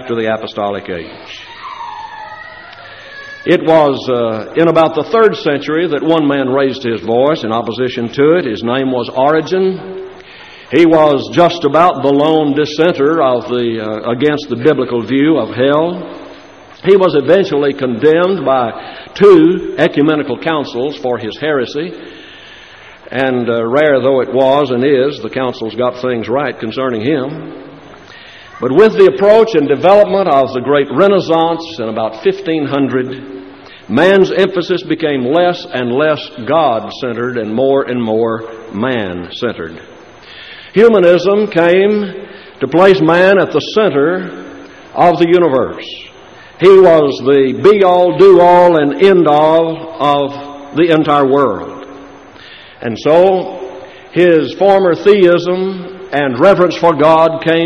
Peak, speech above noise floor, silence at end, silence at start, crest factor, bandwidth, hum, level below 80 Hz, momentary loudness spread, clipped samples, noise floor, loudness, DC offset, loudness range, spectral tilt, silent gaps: 0 dBFS; 26 dB; 0 s; 0 s; 12 dB; 7.4 kHz; none; -50 dBFS; 18 LU; 0.1%; -37 dBFS; -11 LUFS; 0.1%; 7 LU; -7 dB/octave; none